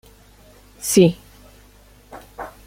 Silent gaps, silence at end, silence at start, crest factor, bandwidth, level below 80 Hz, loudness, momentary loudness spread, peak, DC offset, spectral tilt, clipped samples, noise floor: none; 0.2 s; 0.8 s; 22 dB; 16.5 kHz; -50 dBFS; -17 LUFS; 25 LU; -2 dBFS; under 0.1%; -5 dB/octave; under 0.1%; -49 dBFS